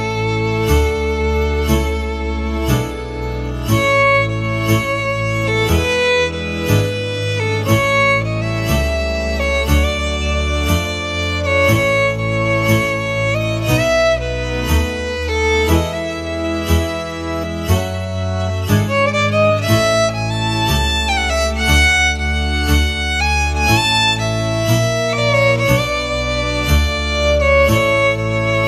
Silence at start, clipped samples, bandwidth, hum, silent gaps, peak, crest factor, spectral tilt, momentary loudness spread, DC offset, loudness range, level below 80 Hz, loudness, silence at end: 0 s; under 0.1%; 14 kHz; none; none; 0 dBFS; 14 dB; -5 dB/octave; 8 LU; under 0.1%; 4 LU; -24 dBFS; -16 LUFS; 0 s